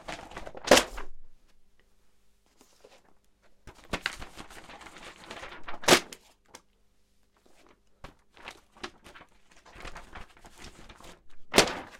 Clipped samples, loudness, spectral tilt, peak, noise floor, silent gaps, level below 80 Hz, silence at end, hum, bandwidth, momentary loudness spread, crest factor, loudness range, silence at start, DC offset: under 0.1%; -25 LUFS; -2 dB/octave; -2 dBFS; -65 dBFS; none; -52 dBFS; 0.05 s; 50 Hz at -70 dBFS; 16.5 kHz; 28 LU; 32 dB; 19 LU; 0.1 s; under 0.1%